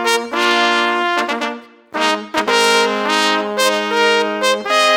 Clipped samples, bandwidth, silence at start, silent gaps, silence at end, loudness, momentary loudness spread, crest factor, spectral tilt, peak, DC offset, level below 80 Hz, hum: under 0.1%; over 20 kHz; 0 s; none; 0 s; -15 LUFS; 6 LU; 16 dB; -1.5 dB/octave; 0 dBFS; under 0.1%; -64 dBFS; none